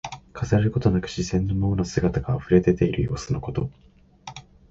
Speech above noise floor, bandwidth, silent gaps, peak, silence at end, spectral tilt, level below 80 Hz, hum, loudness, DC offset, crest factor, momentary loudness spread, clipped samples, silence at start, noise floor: 20 dB; 8 kHz; none; -6 dBFS; 0.3 s; -7 dB/octave; -40 dBFS; none; -24 LUFS; under 0.1%; 18 dB; 21 LU; under 0.1%; 0.05 s; -43 dBFS